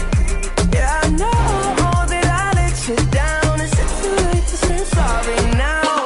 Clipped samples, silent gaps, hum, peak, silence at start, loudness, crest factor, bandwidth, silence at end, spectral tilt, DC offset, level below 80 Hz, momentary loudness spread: under 0.1%; none; none; -6 dBFS; 0 s; -17 LUFS; 10 dB; 12 kHz; 0 s; -5 dB/octave; under 0.1%; -20 dBFS; 2 LU